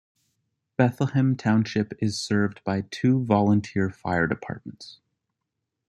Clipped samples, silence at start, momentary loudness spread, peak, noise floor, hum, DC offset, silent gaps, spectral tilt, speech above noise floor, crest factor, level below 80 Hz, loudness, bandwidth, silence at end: under 0.1%; 0.8 s; 15 LU; -4 dBFS; -82 dBFS; none; under 0.1%; none; -6.5 dB/octave; 59 dB; 20 dB; -60 dBFS; -24 LUFS; 11 kHz; 0.95 s